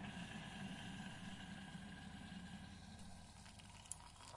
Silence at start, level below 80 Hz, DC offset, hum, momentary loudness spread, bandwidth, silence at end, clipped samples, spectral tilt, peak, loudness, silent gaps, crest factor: 0 s; -68 dBFS; under 0.1%; none; 8 LU; 11.5 kHz; 0 s; under 0.1%; -4 dB/octave; -26 dBFS; -54 LUFS; none; 28 dB